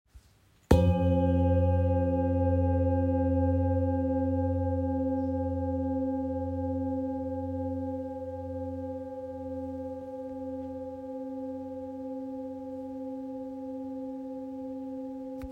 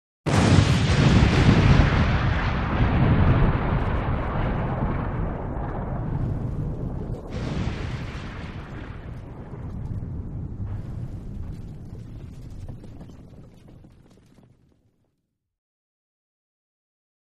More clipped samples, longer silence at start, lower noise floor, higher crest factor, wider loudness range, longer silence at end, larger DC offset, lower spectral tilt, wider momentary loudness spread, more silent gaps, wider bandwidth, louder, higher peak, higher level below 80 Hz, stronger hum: neither; about the same, 0.15 s vs 0.25 s; second, -62 dBFS vs -76 dBFS; about the same, 24 dB vs 20 dB; second, 12 LU vs 21 LU; second, 0 s vs 3.55 s; neither; first, -9.5 dB/octave vs -7 dB/octave; second, 13 LU vs 22 LU; neither; second, 8 kHz vs 11 kHz; second, -31 LUFS vs -23 LUFS; about the same, -6 dBFS vs -4 dBFS; second, -48 dBFS vs -30 dBFS; neither